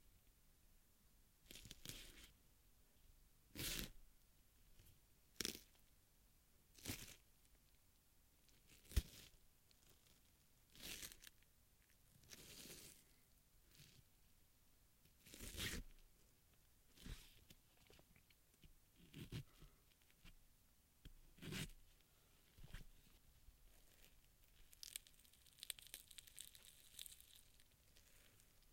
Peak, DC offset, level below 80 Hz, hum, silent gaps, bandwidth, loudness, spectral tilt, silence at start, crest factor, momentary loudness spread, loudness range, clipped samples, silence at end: -20 dBFS; under 0.1%; -64 dBFS; none; none; 16.5 kHz; -54 LUFS; -2.5 dB/octave; 0 s; 38 dB; 21 LU; 8 LU; under 0.1%; 0 s